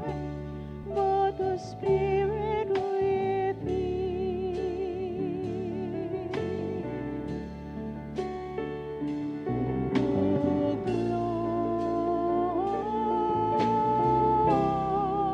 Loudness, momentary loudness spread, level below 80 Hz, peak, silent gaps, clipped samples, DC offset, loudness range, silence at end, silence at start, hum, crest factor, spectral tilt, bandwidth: -29 LUFS; 10 LU; -48 dBFS; -12 dBFS; none; under 0.1%; under 0.1%; 8 LU; 0 s; 0 s; none; 16 dB; -8.5 dB/octave; 8.4 kHz